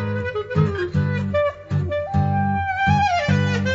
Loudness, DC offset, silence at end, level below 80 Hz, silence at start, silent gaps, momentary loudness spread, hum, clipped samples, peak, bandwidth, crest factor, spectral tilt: -21 LUFS; under 0.1%; 0 s; -42 dBFS; 0 s; none; 5 LU; none; under 0.1%; -6 dBFS; 7.8 kHz; 14 dB; -7 dB/octave